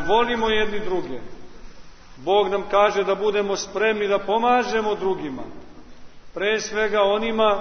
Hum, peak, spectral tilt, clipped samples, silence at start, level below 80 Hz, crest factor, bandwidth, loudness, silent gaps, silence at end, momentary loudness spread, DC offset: none; -4 dBFS; -3.5 dB/octave; under 0.1%; 0 s; -46 dBFS; 18 dB; 6.6 kHz; -21 LUFS; none; 0 s; 14 LU; under 0.1%